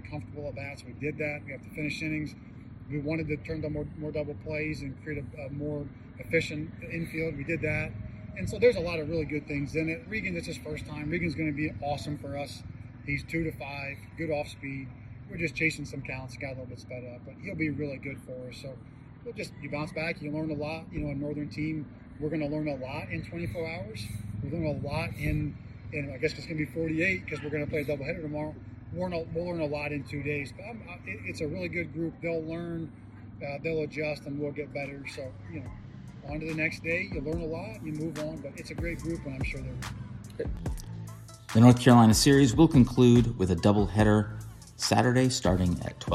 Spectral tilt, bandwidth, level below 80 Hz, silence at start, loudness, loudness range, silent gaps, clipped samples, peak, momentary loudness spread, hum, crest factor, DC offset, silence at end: -6 dB/octave; 14.5 kHz; -48 dBFS; 0.05 s; -30 LUFS; 13 LU; none; under 0.1%; -6 dBFS; 17 LU; none; 24 dB; under 0.1%; 0 s